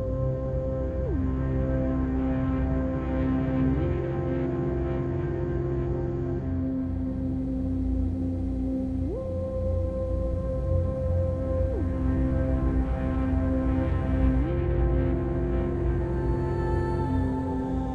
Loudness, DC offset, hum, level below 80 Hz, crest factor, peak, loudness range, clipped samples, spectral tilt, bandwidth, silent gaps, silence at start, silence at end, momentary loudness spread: -28 LUFS; under 0.1%; none; -32 dBFS; 14 dB; -12 dBFS; 3 LU; under 0.1%; -10.5 dB/octave; 4.7 kHz; none; 0 s; 0 s; 4 LU